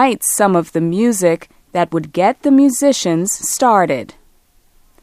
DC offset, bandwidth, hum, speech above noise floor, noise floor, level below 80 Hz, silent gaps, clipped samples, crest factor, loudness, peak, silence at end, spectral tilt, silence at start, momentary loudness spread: under 0.1%; 15.5 kHz; none; 38 dB; -52 dBFS; -54 dBFS; none; under 0.1%; 16 dB; -15 LUFS; 0 dBFS; 0.9 s; -4.5 dB/octave; 0 s; 7 LU